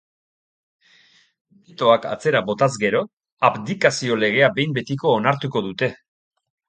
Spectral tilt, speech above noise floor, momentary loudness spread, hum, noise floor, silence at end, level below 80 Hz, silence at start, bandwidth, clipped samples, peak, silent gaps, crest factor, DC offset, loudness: -5 dB/octave; 36 dB; 7 LU; none; -56 dBFS; 0.75 s; -64 dBFS; 1.8 s; 9.4 kHz; under 0.1%; 0 dBFS; 3.13-3.17 s, 3.32-3.37 s; 22 dB; under 0.1%; -20 LUFS